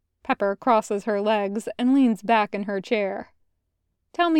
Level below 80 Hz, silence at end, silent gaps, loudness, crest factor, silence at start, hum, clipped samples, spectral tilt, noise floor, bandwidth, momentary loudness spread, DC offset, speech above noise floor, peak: -68 dBFS; 0 s; none; -23 LUFS; 16 dB; 0.3 s; none; under 0.1%; -5.5 dB/octave; -76 dBFS; 12.5 kHz; 9 LU; under 0.1%; 53 dB; -6 dBFS